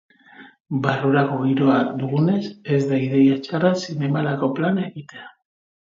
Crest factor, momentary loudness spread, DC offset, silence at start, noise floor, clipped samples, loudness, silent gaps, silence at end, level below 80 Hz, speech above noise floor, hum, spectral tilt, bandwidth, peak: 16 dB; 9 LU; under 0.1%; 0.4 s; -47 dBFS; under 0.1%; -20 LUFS; 0.60-0.65 s; 0.65 s; -66 dBFS; 27 dB; none; -7.5 dB/octave; 7.6 kHz; -4 dBFS